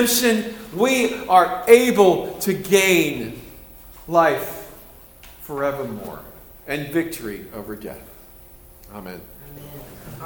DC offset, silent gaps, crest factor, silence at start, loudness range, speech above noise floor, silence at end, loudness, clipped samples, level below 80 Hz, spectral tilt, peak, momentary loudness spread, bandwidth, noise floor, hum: under 0.1%; none; 22 dB; 0 s; 13 LU; 26 dB; 0 s; -19 LUFS; under 0.1%; -50 dBFS; -3.5 dB/octave; 0 dBFS; 24 LU; over 20 kHz; -45 dBFS; none